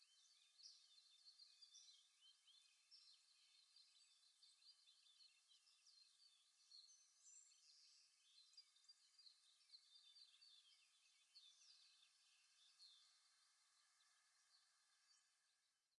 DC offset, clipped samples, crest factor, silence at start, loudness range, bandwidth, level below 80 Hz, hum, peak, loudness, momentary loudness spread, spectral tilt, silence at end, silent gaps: under 0.1%; under 0.1%; 24 dB; 0 s; 1 LU; 11 kHz; under -90 dBFS; none; -50 dBFS; -68 LUFS; 4 LU; 4 dB/octave; 0.05 s; none